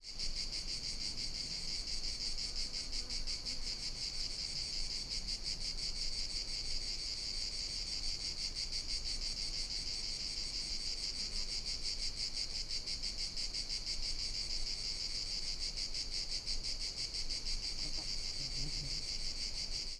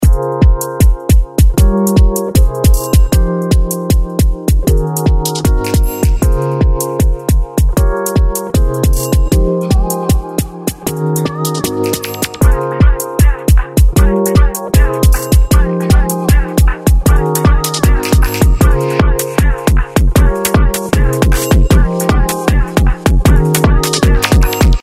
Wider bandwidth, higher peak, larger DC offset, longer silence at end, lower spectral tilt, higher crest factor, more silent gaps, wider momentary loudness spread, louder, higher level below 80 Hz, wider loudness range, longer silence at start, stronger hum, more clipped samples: second, 12 kHz vs 16.5 kHz; second, -24 dBFS vs 0 dBFS; neither; about the same, 0 s vs 0 s; second, -0.5 dB/octave vs -5.5 dB/octave; about the same, 14 dB vs 10 dB; neither; second, 1 LU vs 4 LU; second, -38 LUFS vs -12 LUFS; second, -46 dBFS vs -12 dBFS; about the same, 1 LU vs 3 LU; about the same, 0 s vs 0 s; neither; neither